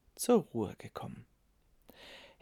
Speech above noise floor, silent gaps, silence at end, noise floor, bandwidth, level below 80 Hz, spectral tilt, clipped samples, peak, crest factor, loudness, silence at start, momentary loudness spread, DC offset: 36 dB; none; 0.2 s; -69 dBFS; 18.5 kHz; -68 dBFS; -5.5 dB/octave; under 0.1%; -16 dBFS; 20 dB; -34 LUFS; 0.15 s; 23 LU; under 0.1%